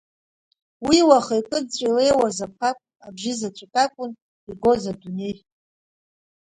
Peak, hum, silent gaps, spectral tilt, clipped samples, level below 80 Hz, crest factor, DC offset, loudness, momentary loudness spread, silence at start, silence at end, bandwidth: -2 dBFS; none; 4.22-4.47 s; -4 dB/octave; under 0.1%; -56 dBFS; 20 dB; under 0.1%; -21 LUFS; 17 LU; 0.8 s; 1.15 s; 11 kHz